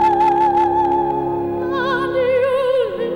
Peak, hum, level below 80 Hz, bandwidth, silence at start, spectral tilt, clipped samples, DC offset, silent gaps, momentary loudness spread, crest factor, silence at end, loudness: -8 dBFS; none; -46 dBFS; 11 kHz; 0 s; -7 dB/octave; under 0.1%; under 0.1%; none; 6 LU; 8 dB; 0 s; -17 LUFS